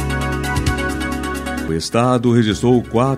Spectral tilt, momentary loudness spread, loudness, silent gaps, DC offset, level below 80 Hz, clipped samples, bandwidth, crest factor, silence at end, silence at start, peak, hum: -6 dB/octave; 8 LU; -18 LUFS; none; under 0.1%; -30 dBFS; under 0.1%; 15 kHz; 16 dB; 0 s; 0 s; -2 dBFS; none